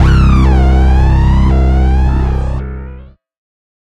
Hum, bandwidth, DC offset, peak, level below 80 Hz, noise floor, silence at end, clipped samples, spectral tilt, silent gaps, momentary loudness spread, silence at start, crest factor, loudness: none; 6.4 kHz; under 0.1%; 0 dBFS; -12 dBFS; -33 dBFS; 0.8 s; under 0.1%; -8.5 dB/octave; none; 13 LU; 0 s; 8 dB; -11 LUFS